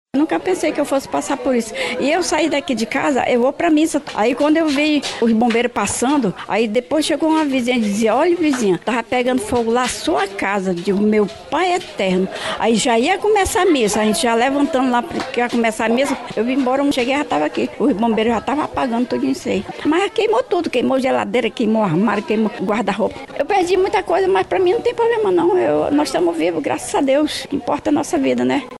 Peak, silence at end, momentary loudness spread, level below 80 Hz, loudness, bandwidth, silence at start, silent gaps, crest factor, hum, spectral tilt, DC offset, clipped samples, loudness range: -6 dBFS; 0 s; 4 LU; -48 dBFS; -17 LUFS; 12.5 kHz; 0.15 s; none; 12 dB; none; -4.5 dB/octave; under 0.1%; under 0.1%; 2 LU